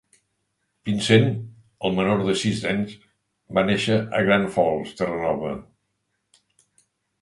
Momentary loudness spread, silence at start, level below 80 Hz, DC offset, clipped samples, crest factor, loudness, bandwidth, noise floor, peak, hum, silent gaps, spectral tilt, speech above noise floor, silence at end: 14 LU; 0.85 s; -54 dBFS; under 0.1%; under 0.1%; 22 dB; -22 LUFS; 11.5 kHz; -75 dBFS; -2 dBFS; none; none; -5.5 dB/octave; 53 dB; 1.6 s